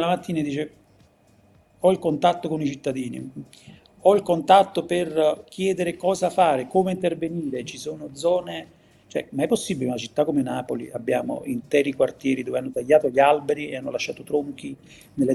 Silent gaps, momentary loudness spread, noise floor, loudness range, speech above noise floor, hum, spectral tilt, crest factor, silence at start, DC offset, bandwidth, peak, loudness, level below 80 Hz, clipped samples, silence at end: none; 14 LU; -57 dBFS; 5 LU; 34 dB; none; -5.5 dB/octave; 20 dB; 0 s; under 0.1%; 13 kHz; -2 dBFS; -23 LUFS; -64 dBFS; under 0.1%; 0 s